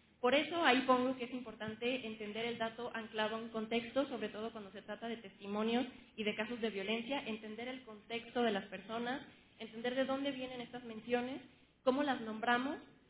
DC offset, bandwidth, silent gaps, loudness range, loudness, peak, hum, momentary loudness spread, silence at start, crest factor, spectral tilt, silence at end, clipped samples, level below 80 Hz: under 0.1%; 4 kHz; none; 4 LU; -38 LUFS; -16 dBFS; none; 13 LU; 0.2 s; 24 dB; -2 dB/octave; 0.25 s; under 0.1%; -74 dBFS